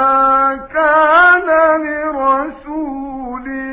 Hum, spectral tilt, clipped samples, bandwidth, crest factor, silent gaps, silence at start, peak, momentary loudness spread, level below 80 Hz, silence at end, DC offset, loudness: none; -7 dB/octave; under 0.1%; 4 kHz; 12 dB; none; 0 s; 0 dBFS; 15 LU; -44 dBFS; 0 s; under 0.1%; -12 LUFS